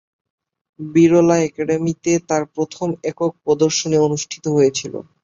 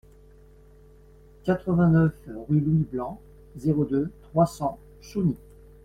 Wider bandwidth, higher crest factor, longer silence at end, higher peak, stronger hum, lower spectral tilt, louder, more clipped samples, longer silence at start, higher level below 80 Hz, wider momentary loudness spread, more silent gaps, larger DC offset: second, 7.8 kHz vs 12.5 kHz; about the same, 16 dB vs 18 dB; second, 0.2 s vs 0.5 s; first, -2 dBFS vs -8 dBFS; neither; second, -5.5 dB/octave vs -9 dB/octave; first, -18 LUFS vs -25 LUFS; neither; second, 0.8 s vs 1.45 s; second, -58 dBFS vs -50 dBFS; second, 10 LU vs 16 LU; neither; neither